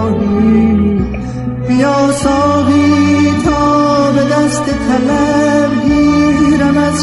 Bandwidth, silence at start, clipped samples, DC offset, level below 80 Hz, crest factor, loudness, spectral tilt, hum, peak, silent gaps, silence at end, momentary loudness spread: 11.5 kHz; 0 s; under 0.1%; under 0.1%; -30 dBFS; 10 dB; -11 LUFS; -6 dB/octave; none; 0 dBFS; none; 0 s; 5 LU